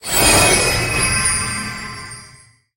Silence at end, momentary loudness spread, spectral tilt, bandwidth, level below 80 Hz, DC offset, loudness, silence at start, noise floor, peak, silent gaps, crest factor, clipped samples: 0.5 s; 21 LU; -2 dB/octave; 16.5 kHz; -32 dBFS; under 0.1%; -14 LUFS; 0.05 s; -47 dBFS; 0 dBFS; none; 18 dB; under 0.1%